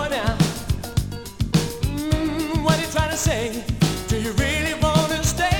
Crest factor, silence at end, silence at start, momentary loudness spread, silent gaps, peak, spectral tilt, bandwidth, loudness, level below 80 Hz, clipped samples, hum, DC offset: 18 dB; 0 s; 0 s; 7 LU; none; -2 dBFS; -4.5 dB/octave; 17.5 kHz; -22 LUFS; -32 dBFS; under 0.1%; none; under 0.1%